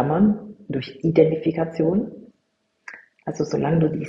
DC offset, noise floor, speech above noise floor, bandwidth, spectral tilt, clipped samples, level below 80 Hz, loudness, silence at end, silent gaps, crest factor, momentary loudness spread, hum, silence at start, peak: under 0.1%; -71 dBFS; 50 dB; 7.4 kHz; -8.5 dB/octave; under 0.1%; -54 dBFS; -22 LUFS; 0 s; none; 20 dB; 17 LU; none; 0 s; -2 dBFS